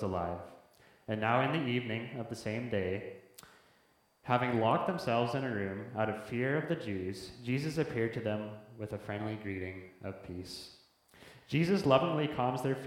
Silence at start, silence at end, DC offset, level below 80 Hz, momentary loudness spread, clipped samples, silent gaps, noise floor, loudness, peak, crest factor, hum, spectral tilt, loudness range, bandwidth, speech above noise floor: 0 s; 0 s; under 0.1%; -66 dBFS; 15 LU; under 0.1%; none; -69 dBFS; -34 LUFS; -10 dBFS; 24 dB; none; -6.5 dB/octave; 5 LU; 16.5 kHz; 36 dB